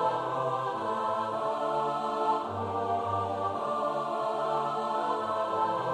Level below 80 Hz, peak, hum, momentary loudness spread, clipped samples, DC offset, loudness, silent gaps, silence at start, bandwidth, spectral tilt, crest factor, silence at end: -74 dBFS; -16 dBFS; none; 2 LU; under 0.1%; under 0.1%; -30 LUFS; none; 0 s; 12 kHz; -6 dB/octave; 14 dB; 0 s